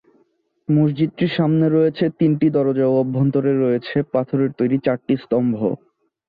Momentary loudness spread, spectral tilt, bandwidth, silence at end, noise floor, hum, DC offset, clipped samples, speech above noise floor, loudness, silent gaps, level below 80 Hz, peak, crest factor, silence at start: 5 LU; -11.5 dB/octave; 5 kHz; 0.5 s; -63 dBFS; none; under 0.1%; under 0.1%; 45 dB; -19 LUFS; none; -60 dBFS; -6 dBFS; 12 dB; 0.7 s